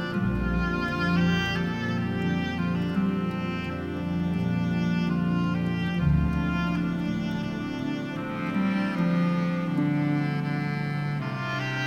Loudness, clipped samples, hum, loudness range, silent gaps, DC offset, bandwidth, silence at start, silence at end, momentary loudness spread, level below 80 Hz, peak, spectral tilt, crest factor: -27 LUFS; under 0.1%; none; 1 LU; none; under 0.1%; 7 kHz; 0 s; 0 s; 6 LU; -42 dBFS; -12 dBFS; -7.5 dB/octave; 14 dB